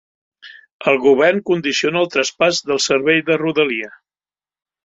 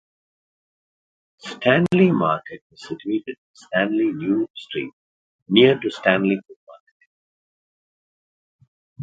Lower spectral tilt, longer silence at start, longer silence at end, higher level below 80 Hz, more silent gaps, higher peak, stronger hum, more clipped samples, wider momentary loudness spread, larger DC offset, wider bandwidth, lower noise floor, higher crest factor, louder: second, -3.5 dB/octave vs -7 dB/octave; second, 0.45 s vs 1.45 s; first, 0.95 s vs 0 s; about the same, -62 dBFS vs -64 dBFS; second, 0.72-0.80 s vs 2.61-2.70 s, 3.38-3.54 s, 4.50-4.54 s, 4.93-5.46 s, 6.56-6.67 s, 6.80-7.00 s, 7.06-8.59 s, 8.68-8.96 s; about the same, -2 dBFS vs 0 dBFS; neither; neither; second, 6 LU vs 21 LU; neither; about the same, 8 kHz vs 7.8 kHz; about the same, under -90 dBFS vs under -90 dBFS; second, 16 dB vs 22 dB; first, -16 LUFS vs -20 LUFS